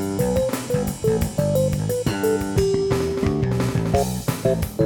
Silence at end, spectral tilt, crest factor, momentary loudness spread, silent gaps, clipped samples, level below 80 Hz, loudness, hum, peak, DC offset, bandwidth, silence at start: 0 s; -6.5 dB/octave; 16 dB; 3 LU; none; under 0.1%; -36 dBFS; -22 LUFS; none; -6 dBFS; under 0.1%; 18 kHz; 0 s